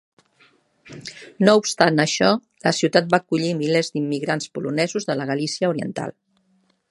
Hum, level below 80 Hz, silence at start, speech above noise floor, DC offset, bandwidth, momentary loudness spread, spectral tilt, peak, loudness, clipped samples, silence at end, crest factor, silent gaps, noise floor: none; -66 dBFS; 0.85 s; 44 dB; under 0.1%; 11.5 kHz; 14 LU; -4.5 dB/octave; 0 dBFS; -21 LUFS; under 0.1%; 0.8 s; 22 dB; none; -64 dBFS